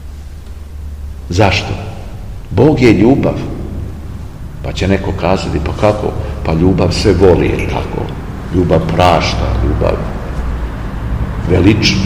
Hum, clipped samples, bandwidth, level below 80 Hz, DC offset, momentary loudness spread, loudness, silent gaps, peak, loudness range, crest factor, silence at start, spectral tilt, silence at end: none; 0.6%; 15 kHz; -22 dBFS; 0.6%; 19 LU; -13 LUFS; none; 0 dBFS; 3 LU; 14 dB; 0 s; -6.5 dB/octave; 0 s